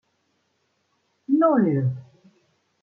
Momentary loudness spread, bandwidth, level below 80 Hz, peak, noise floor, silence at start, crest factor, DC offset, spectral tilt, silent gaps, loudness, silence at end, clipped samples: 20 LU; 3.2 kHz; -74 dBFS; -8 dBFS; -71 dBFS; 1.3 s; 18 dB; under 0.1%; -12 dB/octave; none; -21 LUFS; 0.8 s; under 0.1%